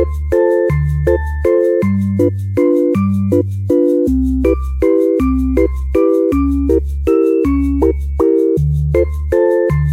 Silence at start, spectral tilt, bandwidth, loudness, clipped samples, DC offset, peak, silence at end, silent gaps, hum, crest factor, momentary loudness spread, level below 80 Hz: 0 s; -10 dB/octave; 14.5 kHz; -14 LUFS; under 0.1%; under 0.1%; 0 dBFS; 0 s; none; none; 12 dB; 3 LU; -22 dBFS